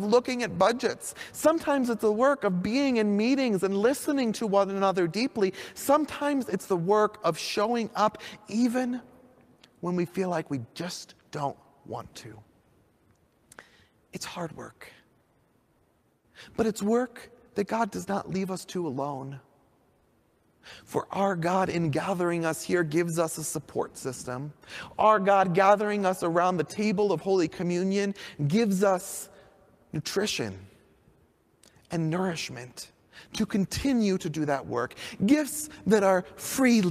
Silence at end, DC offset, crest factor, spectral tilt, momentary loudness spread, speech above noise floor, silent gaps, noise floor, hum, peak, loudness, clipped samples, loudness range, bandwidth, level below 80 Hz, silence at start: 0 s; under 0.1%; 20 dB; -5 dB/octave; 15 LU; 41 dB; none; -68 dBFS; none; -8 dBFS; -27 LUFS; under 0.1%; 12 LU; 15.5 kHz; -62 dBFS; 0 s